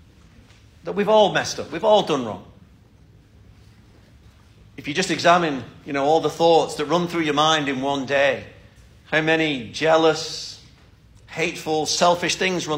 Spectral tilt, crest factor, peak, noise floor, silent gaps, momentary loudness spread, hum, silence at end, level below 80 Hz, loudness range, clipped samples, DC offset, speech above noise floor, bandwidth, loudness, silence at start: -3.5 dB/octave; 18 dB; -4 dBFS; -51 dBFS; none; 14 LU; none; 0 s; -54 dBFS; 6 LU; under 0.1%; under 0.1%; 31 dB; 16 kHz; -20 LUFS; 0.85 s